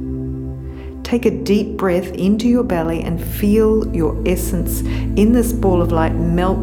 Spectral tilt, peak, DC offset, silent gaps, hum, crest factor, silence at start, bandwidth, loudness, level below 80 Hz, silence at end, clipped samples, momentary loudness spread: -7 dB/octave; -2 dBFS; under 0.1%; none; none; 14 dB; 0 s; over 20 kHz; -17 LUFS; -26 dBFS; 0 s; under 0.1%; 11 LU